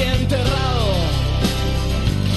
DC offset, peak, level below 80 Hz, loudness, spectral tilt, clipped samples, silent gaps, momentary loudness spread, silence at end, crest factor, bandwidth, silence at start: under 0.1%; -6 dBFS; -24 dBFS; -19 LUFS; -5.5 dB/octave; under 0.1%; none; 2 LU; 0 s; 12 dB; 12.5 kHz; 0 s